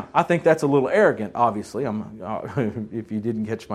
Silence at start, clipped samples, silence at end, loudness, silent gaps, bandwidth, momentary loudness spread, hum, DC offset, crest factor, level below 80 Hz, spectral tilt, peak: 0 s; under 0.1%; 0 s; -23 LUFS; none; 13.5 kHz; 12 LU; none; under 0.1%; 20 dB; -60 dBFS; -7 dB/octave; -2 dBFS